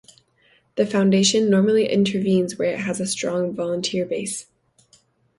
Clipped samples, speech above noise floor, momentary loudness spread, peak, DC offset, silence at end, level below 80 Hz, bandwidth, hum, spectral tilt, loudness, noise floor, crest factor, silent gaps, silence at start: under 0.1%; 40 dB; 9 LU; -6 dBFS; under 0.1%; 0.95 s; -62 dBFS; 11.5 kHz; none; -4.5 dB/octave; -21 LUFS; -60 dBFS; 16 dB; none; 0.75 s